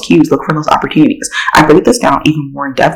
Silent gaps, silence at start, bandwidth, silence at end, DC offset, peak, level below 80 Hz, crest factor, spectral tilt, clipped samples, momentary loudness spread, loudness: none; 0 s; 17.5 kHz; 0 s; under 0.1%; 0 dBFS; -36 dBFS; 10 dB; -5 dB/octave; 2%; 7 LU; -10 LUFS